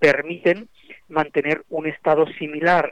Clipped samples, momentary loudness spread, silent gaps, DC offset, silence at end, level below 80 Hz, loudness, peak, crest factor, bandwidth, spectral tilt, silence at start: under 0.1%; 8 LU; none; 0.2%; 0 s; -62 dBFS; -21 LUFS; -6 dBFS; 16 dB; 9.6 kHz; -6.5 dB/octave; 0 s